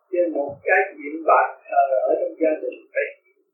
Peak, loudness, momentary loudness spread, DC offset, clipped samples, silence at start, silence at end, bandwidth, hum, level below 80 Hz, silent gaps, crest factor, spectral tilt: -2 dBFS; -22 LUFS; 9 LU; under 0.1%; under 0.1%; 0.1 s; 0.4 s; 3 kHz; none; -76 dBFS; none; 20 dB; -8 dB/octave